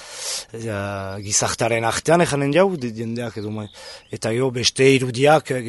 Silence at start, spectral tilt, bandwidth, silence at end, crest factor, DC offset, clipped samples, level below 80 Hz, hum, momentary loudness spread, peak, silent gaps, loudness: 0 s; -4 dB/octave; 12 kHz; 0 s; 18 dB; under 0.1%; under 0.1%; -54 dBFS; none; 13 LU; -2 dBFS; none; -20 LUFS